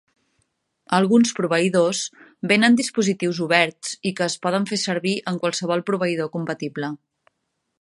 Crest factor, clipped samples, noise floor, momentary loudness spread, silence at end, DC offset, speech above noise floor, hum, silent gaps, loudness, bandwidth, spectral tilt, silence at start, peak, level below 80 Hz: 20 dB; under 0.1%; -76 dBFS; 11 LU; 0.85 s; under 0.1%; 55 dB; none; none; -21 LUFS; 11.5 kHz; -4.5 dB/octave; 0.9 s; -2 dBFS; -70 dBFS